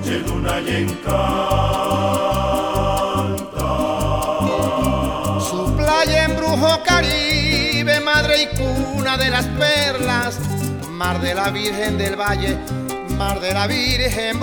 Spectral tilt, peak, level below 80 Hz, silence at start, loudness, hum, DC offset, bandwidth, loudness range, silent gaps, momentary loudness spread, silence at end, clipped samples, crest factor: -4.5 dB/octave; -2 dBFS; -30 dBFS; 0 s; -18 LUFS; none; under 0.1%; over 20 kHz; 4 LU; none; 7 LU; 0 s; under 0.1%; 16 dB